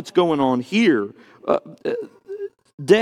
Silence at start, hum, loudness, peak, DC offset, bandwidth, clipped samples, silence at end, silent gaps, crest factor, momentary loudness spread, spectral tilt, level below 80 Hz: 0 s; none; -21 LUFS; 0 dBFS; under 0.1%; 12 kHz; under 0.1%; 0 s; 2.74-2.78 s; 20 dB; 16 LU; -6 dB/octave; -64 dBFS